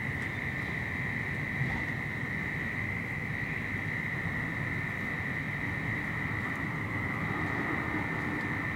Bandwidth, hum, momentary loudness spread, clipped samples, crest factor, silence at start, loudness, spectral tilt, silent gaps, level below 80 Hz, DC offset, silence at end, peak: 16 kHz; none; 2 LU; under 0.1%; 16 dB; 0 s; -33 LUFS; -6.5 dB/octave; none; -52 dBFS; under 0.1%; 0 s; -18 dBFS